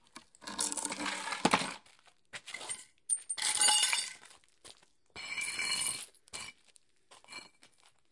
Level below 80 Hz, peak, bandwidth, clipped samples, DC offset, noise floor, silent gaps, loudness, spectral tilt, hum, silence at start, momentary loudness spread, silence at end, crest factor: -74 dBFS; -10 dBFS; 11.5 kHz; under 0.1%; under 0.1%; -68 dBFS; none; -32 LUFS; 0 dB/octave; none; 0.15 s; 22 LU; 0.45 s; 28 dB